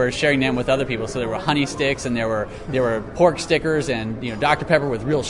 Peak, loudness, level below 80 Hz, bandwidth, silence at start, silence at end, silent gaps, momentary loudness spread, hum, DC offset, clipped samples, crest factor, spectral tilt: -2 dBFS; -21 LUFS; -42 dBFS; 11 kHz; 0 s; 0 s; none; 6 LU; none; under 0.1%; under 0.1%; 18 dB; -5 dB/octave